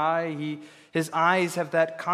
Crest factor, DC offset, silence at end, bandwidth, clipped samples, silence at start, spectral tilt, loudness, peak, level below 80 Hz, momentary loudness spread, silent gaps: 20 dB; under 0.1%; 0 s; 15 kHz; under 0.1%; 0 s; -5 dB/octave; -26 LUFS; -6 dBFS; -80 dBFS; 11 LU; none